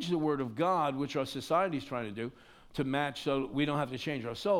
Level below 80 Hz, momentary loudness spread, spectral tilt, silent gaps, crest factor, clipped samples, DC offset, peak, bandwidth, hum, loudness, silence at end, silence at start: -64 dBFS; 8 LU; -6 dB/octave; none; 16 dB; under 0.1%; under 0.1%; -16 dBFS; 16 kHz; none; -33 LUFS; 0 s; 0 s